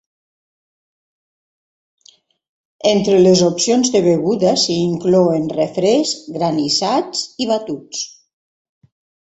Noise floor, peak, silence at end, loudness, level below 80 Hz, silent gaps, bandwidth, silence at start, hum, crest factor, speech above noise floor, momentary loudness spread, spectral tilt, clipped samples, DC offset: -52 dBFS; 0 dBFS; 1.2 s; -16 LUFS; -58 dBFS; none; 8.4 kHz; 2.85 s; none; 16 dB; 36 dB; 10 LU; -4.5 dB/octave; under 0.1%; under 0.1%